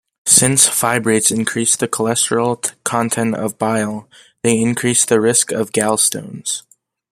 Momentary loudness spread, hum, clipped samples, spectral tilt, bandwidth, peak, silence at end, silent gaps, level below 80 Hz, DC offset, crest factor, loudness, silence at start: 11 LU; none; under 0.1%; -3 dB/octave; 16 kHz; 0 dBFS; 0.5 s; none; -56 dBFS; under 0.1%; 16 dB; -15 LUFS; 0.25 s